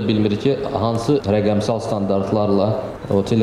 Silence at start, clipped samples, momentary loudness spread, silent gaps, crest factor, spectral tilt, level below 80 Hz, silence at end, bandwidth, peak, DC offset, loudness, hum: 0 s; under 0.1%; 4 LU; none; 12 dB; -7.5 dB/octave; -46 dBFS; 0 s; 12 kHz; -6 dBFS; under 0.1%; -19 LUFS; none